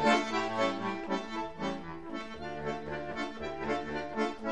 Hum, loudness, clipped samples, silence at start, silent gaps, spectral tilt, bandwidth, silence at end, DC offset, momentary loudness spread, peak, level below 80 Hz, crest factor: none; -35 LUFS; under 0.1%; 0 s; none; -4.5 dB/octave; 11 kHz; 0 s; 0.4%; 10 LU; -14 dBFS; -58 dBFS; 20 dB